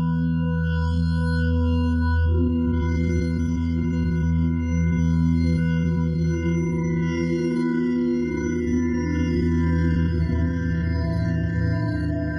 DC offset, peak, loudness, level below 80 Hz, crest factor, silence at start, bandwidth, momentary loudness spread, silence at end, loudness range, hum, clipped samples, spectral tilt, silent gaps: under 0.1%; -12 dBFS; -23 LUFS; -34 dBFS; 10 dB; 0 s; 6.4 kHz; 3 LU; 0 s; 1 LU; none; under 0.1%; -8.5 dB/octave; none